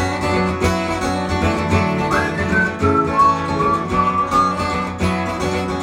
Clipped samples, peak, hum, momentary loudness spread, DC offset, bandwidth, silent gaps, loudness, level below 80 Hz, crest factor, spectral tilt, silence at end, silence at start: under 0.1%; -2 dBFS; none; 5 LU; under 0.1%; 16 kHz; none; -18 LUFS; -36 dBFS; 16 dB; -6 dB/octave; 0 s; 0 s